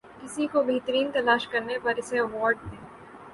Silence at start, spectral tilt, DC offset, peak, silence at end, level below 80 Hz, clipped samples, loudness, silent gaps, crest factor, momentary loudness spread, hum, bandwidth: 0.05 s; -4 dB/octave; under 0.1%; -10 dBFS; 0 s; -58 dBFS; under 0.1%; -26 LUFS; none; 18 dB; 19 LU; none; 11.5 kHz